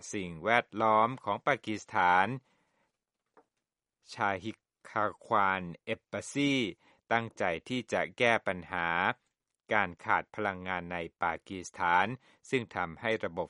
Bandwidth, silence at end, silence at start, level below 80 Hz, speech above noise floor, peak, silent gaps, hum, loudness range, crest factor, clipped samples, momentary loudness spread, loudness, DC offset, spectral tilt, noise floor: 11.5 kHz; 0 s; 0 s; -68 dBFS; 57 dB; -8 dBFS; none; none; 4 LU; 24 dB; under 0.1%; 11 LU; -31 LUFS; under 0.1%; -4.5 dB/octave; -89 dBFS